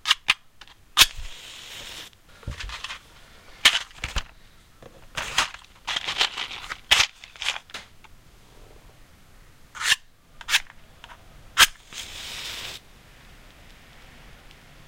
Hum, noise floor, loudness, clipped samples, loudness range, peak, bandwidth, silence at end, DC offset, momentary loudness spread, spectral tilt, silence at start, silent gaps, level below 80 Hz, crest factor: none; -51 dBFS; -23 LUFS; under 0.1%; 4 LU; -2 dBFS; 16.5 kHz; 0.05 s; under 0.1%; 22 LU; 1 dB/octave; 0.05 s; none; -46 dBFS; 28 dB